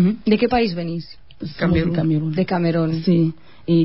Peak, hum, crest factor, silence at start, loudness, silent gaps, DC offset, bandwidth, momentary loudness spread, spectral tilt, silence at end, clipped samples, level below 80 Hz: -4 dBFS; none; 14 dB; 0 s; -20 LUFS; none; 0.9%; 5.8 kHz; 15 LU; -12 dB/octave; 0 s; under 0.1%; -40 dBFS